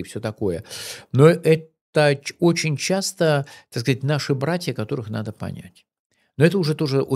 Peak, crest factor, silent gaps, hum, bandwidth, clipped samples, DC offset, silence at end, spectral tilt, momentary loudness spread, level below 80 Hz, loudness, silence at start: -2 dBFS; 20 dB; 1.81-1.93 s, 5.99-6.10 s; none; 14.5 kHz; under 0.1%; under 0.1%; 0 s; -5.5 dB/octave; 15 LU; -60 dBFS; -21 LUFS; 0 s